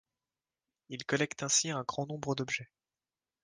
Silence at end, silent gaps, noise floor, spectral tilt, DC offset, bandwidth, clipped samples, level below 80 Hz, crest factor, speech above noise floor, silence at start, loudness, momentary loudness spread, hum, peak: 0.8 s; none; under -90 dBFS; -2.5 dB/octave; under 0.1%; 10 kHz; under 0.1%; -72 dBFS; 22 dB; over 56 dB; 0.9 s; -33 LUFS; 10 LU; none; -16 dBFS